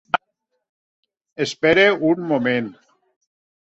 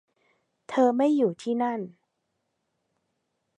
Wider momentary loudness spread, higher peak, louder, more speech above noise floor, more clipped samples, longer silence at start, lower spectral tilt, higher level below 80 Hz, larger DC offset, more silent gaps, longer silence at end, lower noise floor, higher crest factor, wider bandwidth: about the same, 12 LU vs 12 LU; first, -2 dBFS vs -10 dBFS; first, -19 LUFS vs -25 LUFS; about the same, 56 dB vs 54 dB; neither; second, 0.15 s vs 0.7 s; second, -5 dB/octave vs -6.5 dB/octave; first, -58 dBFS vs -84 dBFS; neither; first, 0.69-1.03 s, 1.32-1.36 s vs none; second, 1.05 s vs 1.7 s; second, -74 dBFS vs -78 dBFS; about the same, 20 dB vs 20 dB; second, 8.2 kHz vs 10.5 kHz